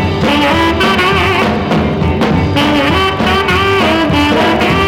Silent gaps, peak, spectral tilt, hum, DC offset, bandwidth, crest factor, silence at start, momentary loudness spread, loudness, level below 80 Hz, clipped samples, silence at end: none; -2 dBFS; -5.5 dB/octave; none; 0.2%; 18 kHz; 10 dB; 0 s; 3 LU; -11 LUFS; -26 dBFS; under 0.1%; 0 s